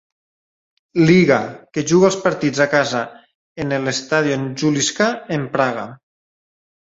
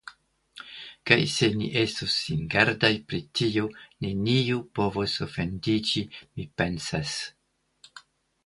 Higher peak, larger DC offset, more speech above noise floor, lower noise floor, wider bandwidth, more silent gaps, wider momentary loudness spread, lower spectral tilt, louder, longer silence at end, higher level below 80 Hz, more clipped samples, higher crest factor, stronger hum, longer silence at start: about the same, -2 dBFS vs -2 dBFS; neither; first, over 73 dB vs 32 dB; first, under -90 dBFS vs -59 dBFS; second, 8 kHz vs 11.5 kHz; first, 3.35-3.55 s vs none; second, 12 LU vs 16 LU; about the same, -5 dB/octave vs -4.5 dB/octave; first, -17 LUFS vs -26 LUFS; first, 1 s vs 0.45 s; about the same, -56 dBFS vs -52 dBFS; neither; second, 18 dB vs 26 dB; neither; first, 0.95 s vs 0.05 s